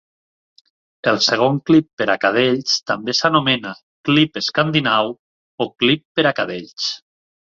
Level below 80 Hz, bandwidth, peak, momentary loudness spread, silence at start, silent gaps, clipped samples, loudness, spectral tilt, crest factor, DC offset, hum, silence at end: -60 dBFS; 7.6 kHz; -2 dBFS; 10 LU; 1.05 s; 1.93-1.97 s, 3.83-4.04 s, 5.19-5.58 s, 6.05-6.15 s; under 0.1%; -18 LUFS; -4.5 dB/octave; 18 dB; under 0.1%; none; 0.6 s